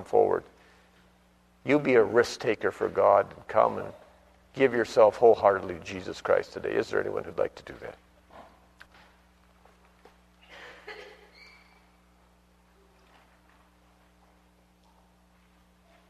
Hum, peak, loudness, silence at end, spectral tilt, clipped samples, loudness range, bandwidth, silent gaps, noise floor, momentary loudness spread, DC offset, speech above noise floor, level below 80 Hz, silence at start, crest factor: 60 Hz at -65 dBFS; -6 dBFS; -26 LUFS; 5.05 s; -5.5 dB/octave; under 0.1%; 11 LU; 12.5 kHz; none; -62 dBFS; 23 LU; under 0.1%; 37 dB; -62 dBFS; 0 s; 22 dB